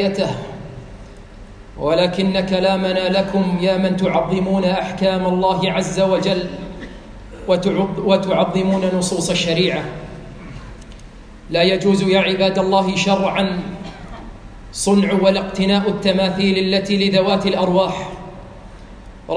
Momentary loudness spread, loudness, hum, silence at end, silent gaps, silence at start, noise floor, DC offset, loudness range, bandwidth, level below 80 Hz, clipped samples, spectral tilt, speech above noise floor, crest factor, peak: 20 LU; -17 LUFS; none; 0 s; none; 0 s; -38 dBFS; under 0.1%; 3 LU; 10.5 kHz; -40 dBFS; under 0.1%; -5.5 dB/octave; 21 dB; 16 dB; -2 dBFS